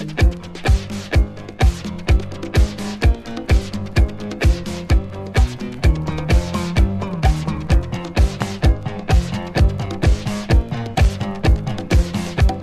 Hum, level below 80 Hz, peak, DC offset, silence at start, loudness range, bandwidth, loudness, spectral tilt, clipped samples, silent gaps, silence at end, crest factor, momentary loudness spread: none; -20 dBFS; -4 dBFS; under 0.1%; 0 s; 1 LU; 13.5 kHz; -20 LUFS; -6.5 dB/octave; under 0.1%; none; 0 s; 14 dB; 4 LU